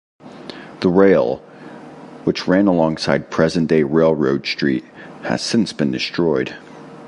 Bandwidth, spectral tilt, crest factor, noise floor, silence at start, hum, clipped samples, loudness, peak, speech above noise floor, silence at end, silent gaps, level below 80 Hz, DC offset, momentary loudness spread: 11.5 kHz; -6 dB/octave; 18 dB; -37 dBFS; 0.25 s; none; under 0.1%; -18 LUFS; 0 dBFS; 20 dB; 0 s; none; -50 dBFS; under 0.1%; 23 LU